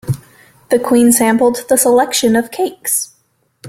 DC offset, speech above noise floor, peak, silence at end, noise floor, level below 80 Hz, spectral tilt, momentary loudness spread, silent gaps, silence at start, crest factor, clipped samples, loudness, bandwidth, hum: under 0.1%; 46 dB; 0 dBFS; 0 s; -59 dBFS; -50 dBFS; -4 dB/octave; 11 LU; none; 0.05 s; 14 dB; under 0.1%; -13 LUFS; 16.5 kHz; none